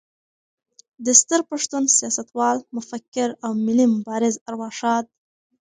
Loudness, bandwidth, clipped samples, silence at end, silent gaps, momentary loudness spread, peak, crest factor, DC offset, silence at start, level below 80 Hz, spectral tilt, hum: -20 LUFS; 10 kHz; under 0.1%; 0.55 s; 3.08-3.12 s, 4.41-4.46 s; 15 LU; 0 dBFS; 22 dB; under 0.1%; 1 s; -72 dBFS; -2.5 dB/octave; none